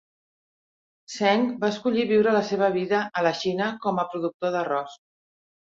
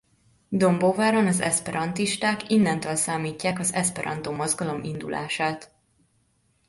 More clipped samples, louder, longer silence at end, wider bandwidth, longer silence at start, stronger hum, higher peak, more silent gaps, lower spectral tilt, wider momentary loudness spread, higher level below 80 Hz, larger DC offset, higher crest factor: neither; about the same, -24 LUFS vs -24 LUFS; second, 0.8 s vs 1.05 s; second, 7.8 kHz vs 12 kHz; first, 1.1 s vs 0.5 s; neither; about the same, -6 dBFS vs -8 dBFS; first, 4.34-4.40 s vs none; first, -5.5 dB/octave vs -4 dB/octave; about the same, 7 LU vs 9 LU; second, -70 dBFS vs -60 dBFS; neither; about the same, 18 dB vs 16 dB